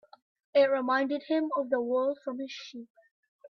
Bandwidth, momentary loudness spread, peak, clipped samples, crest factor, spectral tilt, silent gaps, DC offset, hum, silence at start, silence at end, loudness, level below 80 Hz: 6.4 kHz; 15 LU; -14 dBFS; under 0.1%; 18 dB; -4.5 dB/octave; 2.90-2.95 s, 3.11-3.39 s; under 0.1%; none; 0.55 s; 0 s; -29 LUFS; -82 dBFS